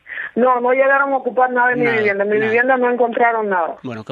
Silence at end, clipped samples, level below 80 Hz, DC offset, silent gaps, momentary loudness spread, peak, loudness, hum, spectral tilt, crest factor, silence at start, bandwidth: 0.1 s; under 0.1%; -66 dBFS; under 0.1%; none; 6 LU; -2 dBFS; -16 LUFS; none; -7.5 dB/octave; 14 dB; 0.1 s; 5.2 kHz